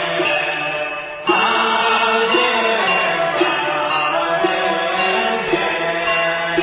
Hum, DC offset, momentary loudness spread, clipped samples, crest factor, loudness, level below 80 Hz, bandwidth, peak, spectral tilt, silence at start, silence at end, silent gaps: none; under 0.1%; 4 LU; under 0.1%; 14 dB; -16 LUFS; -54 dBFS; 4 kHz; -4 dBFS; -7.5 dB/octave; 0 s; 0 s; none